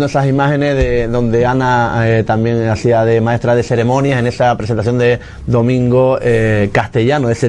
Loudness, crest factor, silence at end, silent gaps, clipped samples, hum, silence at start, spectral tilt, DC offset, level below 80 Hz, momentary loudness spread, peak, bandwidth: -13 LUFS; 12 dB; 0 s; none; under 0.1%; none; 0 s; -7.5 dB/octave; under 0.1%; -32 dBFS; 3 LU; 0 dBFS; 10 kHz